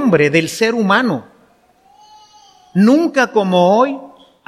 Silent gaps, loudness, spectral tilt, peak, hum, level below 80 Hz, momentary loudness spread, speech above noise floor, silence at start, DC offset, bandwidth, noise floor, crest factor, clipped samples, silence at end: none; -14 LUFS; -5.5 dB/octave; 0 dBFS; none; -60 dBFS; 9 LU; 39 dB; 0 s; under 0.1%; 15 kHz; -52 dBFS; 14 dB; under 0.1%; 0.4 s